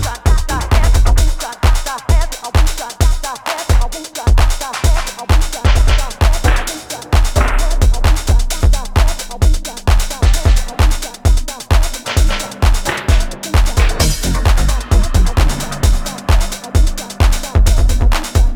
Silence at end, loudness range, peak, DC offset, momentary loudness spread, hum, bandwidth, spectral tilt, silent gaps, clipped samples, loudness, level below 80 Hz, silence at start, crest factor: 0 s; 1 LU; 0 dBFS; under 0.1%; 4 LU; none; 17.5 kHz; -4.5 dB/octave; none; under 0.1%; -16 LUFS; -12 dBFS; 0 s; 12 dB